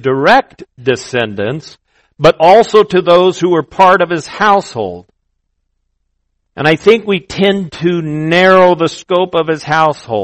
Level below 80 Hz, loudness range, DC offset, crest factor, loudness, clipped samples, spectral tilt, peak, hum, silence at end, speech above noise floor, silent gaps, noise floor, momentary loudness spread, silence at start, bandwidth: -46 dBFS; 5 LU; under 0.1%; 12 dB; -11 LUFS; 1%; -5.5 dB/octave; 0 dBFS; none; 0 s; 55 dB; none; -66 dBFS; 10 LU; 0.05 s; 10 kHz